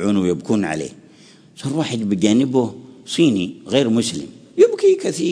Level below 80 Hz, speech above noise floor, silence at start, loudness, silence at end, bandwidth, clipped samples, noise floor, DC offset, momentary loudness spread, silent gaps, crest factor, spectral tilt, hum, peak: -58 dBFS; 29 dB; 0 s; -18 LUFS; 0 s; 11 kHz; under 0.1%; -47 dBFS; under 0.1%; 12 LU; none; 18 dB; -5.5 dB/octave; none; -2 dBFS